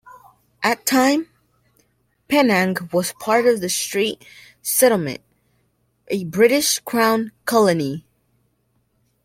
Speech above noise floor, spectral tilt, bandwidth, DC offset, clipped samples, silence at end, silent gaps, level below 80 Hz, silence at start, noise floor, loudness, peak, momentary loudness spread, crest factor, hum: 48 dB; -3.5 dB/octave; 16.5 kHz; under 0.1%; under 0.1%; 1.25 s; none; -62 dBFS; 0.6 s; -66 dBFS; -19 LUFS; -2 dBFS; 12 LU; 18 dB; none